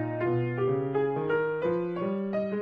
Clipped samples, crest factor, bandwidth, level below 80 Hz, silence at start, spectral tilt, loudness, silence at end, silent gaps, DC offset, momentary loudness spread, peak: under 0.1%; 12 dB; 5 kHz; -66 dBFS; 0 s; -10 dB/octave; -29 LUFS; 0 s; none; under 0.1%; 3 LU; -16 dBFS